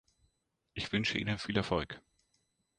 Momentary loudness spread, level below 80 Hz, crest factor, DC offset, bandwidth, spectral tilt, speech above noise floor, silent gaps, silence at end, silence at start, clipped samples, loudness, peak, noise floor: 14 LU; -56 dBFS; 22 dB; under 0.1%; 10.5 kHz; -5 dB/octave; 46 dB; none; 0.8 s; 0.75 s; under 0.1%; -34 LUFS; -16 dBFS; -80 dBFS